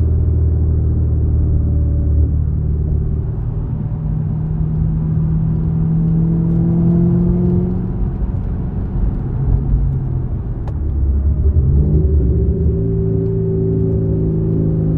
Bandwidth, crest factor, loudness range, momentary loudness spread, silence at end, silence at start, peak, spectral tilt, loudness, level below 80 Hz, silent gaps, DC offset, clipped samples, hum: 2 kHz; 12 dB; 3 LU; 7 LU; 0 s; 0 s; -2 dBFS; -14 dB/octave; -17 LUFS; -20 dBFS; none; under 0.1%; under 0.1%; none